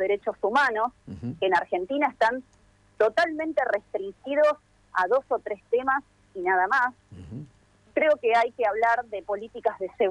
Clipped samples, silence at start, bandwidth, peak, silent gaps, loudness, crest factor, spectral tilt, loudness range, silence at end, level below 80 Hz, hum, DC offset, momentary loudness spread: under 0.1%; 0 s; 10.5 kHz; -10 dBFS; none; -25 LUFS; 16 dB; -5.5 dB/octave; 1 LU; 0 s; -62 dBFS; none; under 0.1%; 12 LU